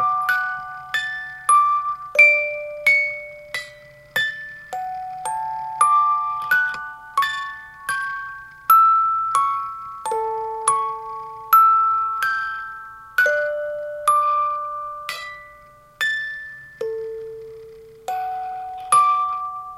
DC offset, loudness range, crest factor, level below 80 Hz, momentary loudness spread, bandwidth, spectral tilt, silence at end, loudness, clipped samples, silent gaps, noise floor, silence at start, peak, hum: under 0.1%; 8 LU; 20 dB; -60 dBFS; 17 LU; 15.5 kHz; 0 dB/octave; 0 s; -20 LUFS; under 0.1%; none; -47 dBFS; 0 s; -2 dBFS; none